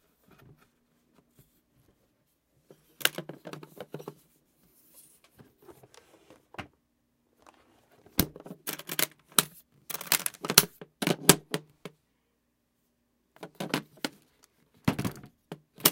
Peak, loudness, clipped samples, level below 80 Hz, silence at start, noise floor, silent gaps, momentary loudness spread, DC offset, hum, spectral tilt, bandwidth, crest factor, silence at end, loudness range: 0 dBFS; -28 LUFS; under 0.1%; -60 dBFS; 3 s; -76 dBFS; none; 27 LU; under 0.1%; none; -2.5 dB/octave; 17 kHz; 34 dB; 0 s; 15 LU